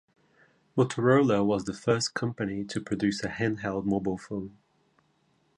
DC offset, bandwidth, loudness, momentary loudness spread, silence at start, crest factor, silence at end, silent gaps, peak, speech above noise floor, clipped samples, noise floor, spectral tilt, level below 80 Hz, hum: under 0.1%; 11 kHz; -28 LUFS; 11 LU; 0.75 s; 18 dB; 1.05 s; none; -10 dBFS; 42 dB; under 0.1%; -69 dBFS; -6 dB/octave; -60 dBFS; none